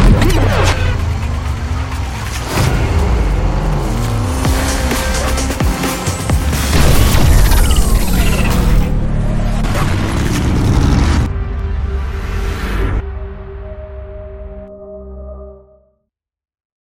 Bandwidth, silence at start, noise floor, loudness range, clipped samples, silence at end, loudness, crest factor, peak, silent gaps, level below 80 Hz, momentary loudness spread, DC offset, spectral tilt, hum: 17 kHz; 0 s; -71 dBFS; 11 LU; under 0.1%; 1.25 s; -15 LUFS; 14 dB; 0 dBFS; none; -16 dBFS; 18 LU; under 0.1%; -5 dB/octave; none